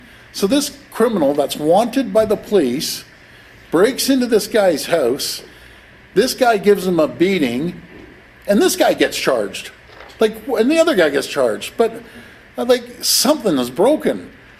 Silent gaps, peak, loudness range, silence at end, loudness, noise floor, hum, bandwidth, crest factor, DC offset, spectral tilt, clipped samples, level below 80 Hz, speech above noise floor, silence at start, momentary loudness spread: none; -2 dBFS; 2 LU; 0.3 s; -16 LUFS; -43 dBFS; none; 16 kHz; 16 dB; under 0.1%; -4 dB/octave; under 0.1%; -50 dBFS; 27 dB; 0.35 s; 11 LU